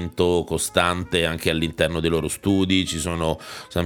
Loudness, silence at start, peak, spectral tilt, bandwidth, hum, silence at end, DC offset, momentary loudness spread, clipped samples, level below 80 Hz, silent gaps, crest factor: -22 LUFS; 0 s; -2 dBFS; -4.5 dB/octave; 19.5 kHz; none; 0 s; under 0.1%; 5 LU; under 0.1%; -42 dBFS; none; 20 dB